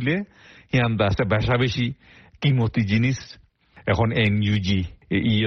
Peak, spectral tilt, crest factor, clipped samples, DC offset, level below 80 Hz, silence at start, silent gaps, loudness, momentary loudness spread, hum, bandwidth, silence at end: -6 dBFS; -7 dB/octave; 16 dB; under 0.1%; under 0.1%; -42 dBFS; 0 s; none; -22 LUFS; 9 LU; none; 6.4 kHz; 0 s